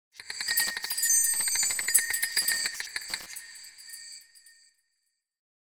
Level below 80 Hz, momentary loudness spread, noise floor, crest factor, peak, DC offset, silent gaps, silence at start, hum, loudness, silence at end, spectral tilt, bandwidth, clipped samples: -68 dBFS; 21 LU; -79 dBFS; 26 dB; -6 dBFS; under 0.1%; none; 0.15 s; none; -25 LUFS; 1.35 s; 3.5 dB/octave; 16 kHz; under 0.1%